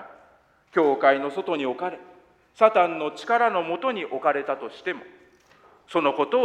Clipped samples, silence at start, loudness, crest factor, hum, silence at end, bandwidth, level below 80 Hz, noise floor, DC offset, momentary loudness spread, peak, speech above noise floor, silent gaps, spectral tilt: under 0.1%; 0 s; -24 LUFS; 22 dB; none; 0 s; 9.2 kHz; -74 dBFS; -58 dBFS; under 0.1%; 12 LU; -4 dBFS; 35 dB; none; -5.5 dB/octave